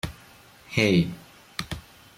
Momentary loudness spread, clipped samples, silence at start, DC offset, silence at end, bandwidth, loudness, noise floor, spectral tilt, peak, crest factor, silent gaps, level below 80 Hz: 17 LU; under 0.1%; 0.05 s; under 0.1%; 0.35 s; 16 kHz; -25 LUFS; -52 dBFS; -5.5 dB/octave; -6 dBFS; 22 dB; none; -50 dBFS